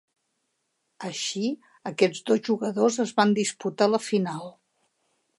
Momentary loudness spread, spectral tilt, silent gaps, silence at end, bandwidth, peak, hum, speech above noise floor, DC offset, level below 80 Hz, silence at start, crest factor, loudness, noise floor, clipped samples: 13 LU; -4.5 dB/octave; none; 0.9 s; 11.5 kHz; -6 dBFS; none; 52 dB; under 0.1%; -78 dBFS; 1 s; 22 dB; -25 LUFS; -76 dBFS; under 0.1%